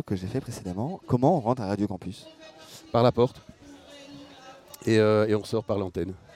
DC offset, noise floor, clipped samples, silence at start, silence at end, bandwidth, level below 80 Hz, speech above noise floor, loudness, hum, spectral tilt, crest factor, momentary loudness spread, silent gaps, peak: under 0.1%; -48 dBFS; under 0.1%; 0.05 s; 0.2 s; 15.5 kHz; -56 dBFS; 22 dB; -26 LUFS; none; -7 dB/octave; 20 dB; 24 LU; none; -6 dBFS